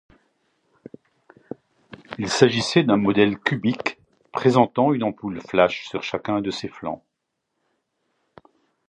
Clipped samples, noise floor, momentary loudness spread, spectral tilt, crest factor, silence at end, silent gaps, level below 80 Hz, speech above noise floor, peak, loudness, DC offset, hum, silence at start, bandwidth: under 0.1%; -78 dBFS; 17 LU; -5.5 dB/octave; 22 dB; 1.9 s; none; -60 dBFS; 57 dB; 0 dBFS; -22 LUFS; under 0.1%; none; 2.1 s; 10.5 kHz